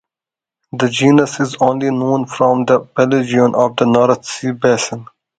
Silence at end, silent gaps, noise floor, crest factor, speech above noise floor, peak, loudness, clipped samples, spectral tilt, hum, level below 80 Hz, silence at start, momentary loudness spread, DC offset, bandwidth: 0.35 s; none; -88 dBFS; 14 dB; 75 dB; 0 dBFS; -14 LUFS; under 0.1%; -5.5 dB/octave; none; -56 dBFS; 0.75 s; 7 LU; under 0.1%; 9.4 kHz